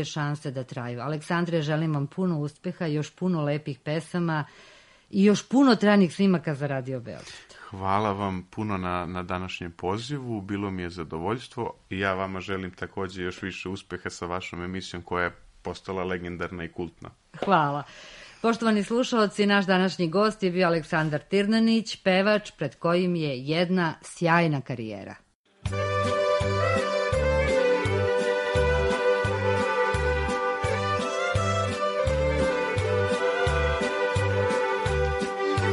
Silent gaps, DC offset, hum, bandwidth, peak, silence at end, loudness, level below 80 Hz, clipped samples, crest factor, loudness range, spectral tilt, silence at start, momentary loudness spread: 25.35-25.44 s; under 0.1%; none; 11.5 kHz; -6 dBFS; 0 s; -26 LUFS; -42 dBFS; under 0.1%; 20 dB; 8 LU; -6 dB/octave; 0 s; 12 LU